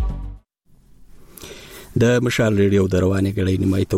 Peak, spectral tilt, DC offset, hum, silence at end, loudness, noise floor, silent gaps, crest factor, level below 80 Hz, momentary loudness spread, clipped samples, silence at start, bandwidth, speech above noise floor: -6 dBFS; -6.5 dB/octave; under 0.1%; none; 0 s; -18 LUFS; -54 dBFS; none; 14 dB; -36 dBFS; 21 LU; under 0.1%; 0 s; 16 kHz; 37 dB